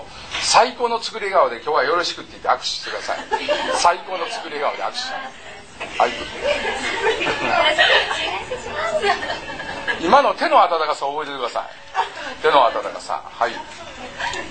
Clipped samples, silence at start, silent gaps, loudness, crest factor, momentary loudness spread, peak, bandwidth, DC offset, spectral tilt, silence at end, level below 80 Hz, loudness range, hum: under 0.1%; 0 s; none; -20 LUFS; 20 dB; 13 LU; 0 dBFS; 9.2 kHz; 0.5%; -1.5 dB/octave; 0 s; -50 dBFS; 4 LU; none